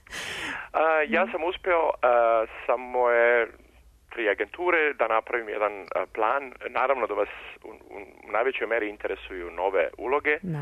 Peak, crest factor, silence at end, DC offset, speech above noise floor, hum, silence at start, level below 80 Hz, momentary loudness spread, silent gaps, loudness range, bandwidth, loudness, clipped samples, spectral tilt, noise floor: -10 dBFS; 16 dB; 0 s; under 0.1%; 25 dB; none; 0.1 s; -58 dBFS; 12 LU; none; 5 LU; 13.5 kHz; -26 LUFS; under 0.1%; -5 dB/octave; -50 dBFS